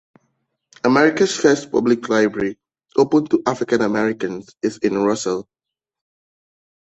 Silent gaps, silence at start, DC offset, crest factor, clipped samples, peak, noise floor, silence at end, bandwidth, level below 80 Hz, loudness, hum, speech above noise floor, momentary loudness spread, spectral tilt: none; 0.85 s; under 0.1%; 20 dB; under 0.1%; 0 dBFS; -70 dBFS; 1.45 s; 8.4 kHz; -60 dBFS; -19 LUFS; none; 53 dB; 10 LU; -5 dB/octave